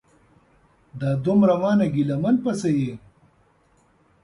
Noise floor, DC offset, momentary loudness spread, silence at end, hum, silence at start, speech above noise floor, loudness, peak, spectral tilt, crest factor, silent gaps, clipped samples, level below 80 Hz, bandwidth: -61 dBFS; under 0.1%; 12 LU; 1.25 s; none; 0.95 s; 40 dB; -21 LUFS; -6 dBFS; -8 dB/octave; 18 dB; none; under 0.1%; -58 dBFS; 11 kHz